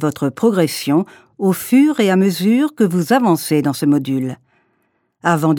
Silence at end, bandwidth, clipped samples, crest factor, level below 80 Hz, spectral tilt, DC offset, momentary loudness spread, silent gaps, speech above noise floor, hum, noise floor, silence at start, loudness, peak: 0 s; 18.5 kHz; under 0.1%; 16 dB; -64 dBFS; -6 dB/octave; under 0.1%; 8 LU; none; 50 dB; none; -65 dBFS; 0 s; -16 LUFS; 0 dBFS